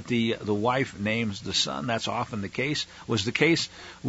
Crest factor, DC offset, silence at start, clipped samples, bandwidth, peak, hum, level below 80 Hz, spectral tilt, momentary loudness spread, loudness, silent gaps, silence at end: 20 dB; under 0.1%; 0 s; under 0.1%; 8 kHz; -8 dBFS; none; -58 dBFS; -4 dB/octave; 7 LU; -27 LUFS; none; 0 s